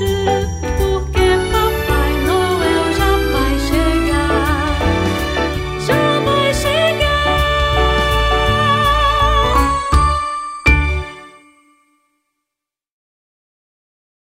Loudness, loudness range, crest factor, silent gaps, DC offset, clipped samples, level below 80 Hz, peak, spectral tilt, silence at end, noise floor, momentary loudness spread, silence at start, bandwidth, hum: -15 LUFS; 5 LU; 16 dB; none; under 0.1%; under 0.1%; -22 dBFS; 0 dBFS; -5 dB/octave; 2.95 s; -83 dBFS; 5 LU; 0 s; 16 kHz; none